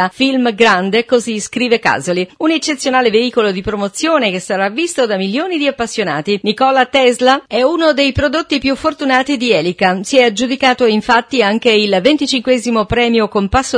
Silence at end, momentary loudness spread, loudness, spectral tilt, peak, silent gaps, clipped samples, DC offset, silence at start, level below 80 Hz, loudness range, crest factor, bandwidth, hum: 0 s; 5 LU; -13 LUFS; -4 dB/octave; 0 dBFS; none; under 0.1%; under 0.1%; 0 s; -40 dBFS; 2 LU; 14 dB; 11 kHz; none